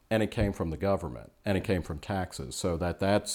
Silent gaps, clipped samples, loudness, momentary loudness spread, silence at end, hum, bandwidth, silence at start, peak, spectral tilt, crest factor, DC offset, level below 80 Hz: none; under 0.1%; -31 LUFS; 7 LU; 0 s; none; 18.5 kHz; 0.1 s; -12 dBFS; -5.5 dB/octave; 18 dB; under 0.1%; -46 dBFS